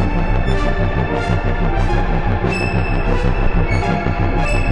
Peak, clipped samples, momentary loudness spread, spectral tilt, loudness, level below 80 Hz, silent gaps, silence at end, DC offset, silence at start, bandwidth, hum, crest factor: -2 dBFS; under 0.1%; 1 LU; -7 dB/octave; -18 LUFS; -18 dBFS; none; 0 s; under 0.1%; 0 s; 10 kHz; none; 14 dB